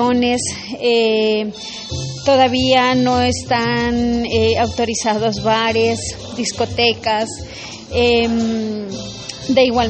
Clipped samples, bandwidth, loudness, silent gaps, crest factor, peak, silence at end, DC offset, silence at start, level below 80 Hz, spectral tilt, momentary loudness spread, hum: under 0.1%; 8.8 kHz; -17 LUFS; none; 16 dB; -2 dBFS; 0 s; under 0.1%; 0 s; -40 dBFS; -4 dB/octave; 12 LU; none